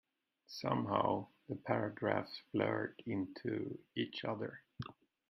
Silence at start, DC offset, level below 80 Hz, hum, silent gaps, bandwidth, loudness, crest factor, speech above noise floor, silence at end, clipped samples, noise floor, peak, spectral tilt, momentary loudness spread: 0.5 s; under 0.1%; -76 dBFS; none; none; 13.5 kHz; -39 LUFS; 24 dB; 24 dB; 0.35 s; under 0.1%; -62 dBFS; -16 dBFS; -7 dB/octave; 13 LU